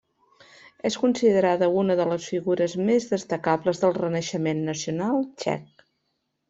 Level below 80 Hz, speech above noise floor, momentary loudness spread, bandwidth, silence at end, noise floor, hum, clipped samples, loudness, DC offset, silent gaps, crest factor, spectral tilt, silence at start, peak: -66 dBFS; 53 dB; 8 LU; 8 kHz; 0.85 s; -76 dBFS; none; under 0.1%; -24 LUFS; under 0.1%; none; 18 dB; -5.5 dB/octave; 0.85 s; -6 dBFS